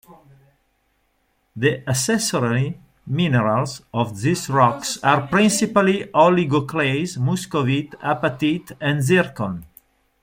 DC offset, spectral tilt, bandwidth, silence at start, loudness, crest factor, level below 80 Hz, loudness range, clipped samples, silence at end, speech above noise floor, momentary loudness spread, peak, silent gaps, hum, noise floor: under 0.1%; -5 dB/octave; 16.5 kHz; 1.55 s; -20 LUFS; 18 dB; -56 dBFS; 4 LU; under 0.1%; 0.55 s; 47 dB; 8 LU; -2 dBFS; none; none; -67 dBFS